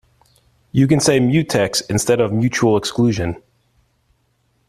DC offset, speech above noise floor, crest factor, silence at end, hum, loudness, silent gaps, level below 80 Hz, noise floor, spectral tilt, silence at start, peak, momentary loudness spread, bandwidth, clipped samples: under 0.1%; 48 dB; 16 dB; 1.35 s; none; -17 LUFS; none; -48 dBFS; -63 dBFS; -5 dB/octave; 0.75 s; -2 dBFS; 9 LU; 14 kHz; under 0.1%